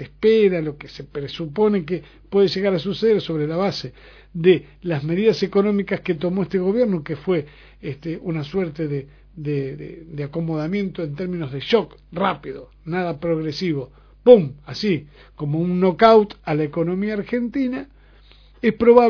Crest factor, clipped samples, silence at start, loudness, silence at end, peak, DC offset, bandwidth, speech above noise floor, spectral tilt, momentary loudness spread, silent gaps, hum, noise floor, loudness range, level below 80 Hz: 20 dB; under 0.1%; 0 s; -21 LUFS; 0 s; 0 dBFS; under 0.1%; 5.4 kHz; 28 dB; -7.5 dB/octave; 16 LU; none; none; -49 dBFS; 8 LU; -50 dBFS